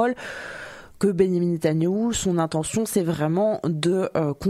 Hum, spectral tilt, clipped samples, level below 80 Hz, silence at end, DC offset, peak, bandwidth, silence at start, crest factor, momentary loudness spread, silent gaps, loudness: none; -6 dB/octave; under 0.1%; -50 dBFS; 0 s; under 0.1%; -6 dBFS; 14.5 kHz; 0 s; 16 dB; 12 LU; none; -23 LUFS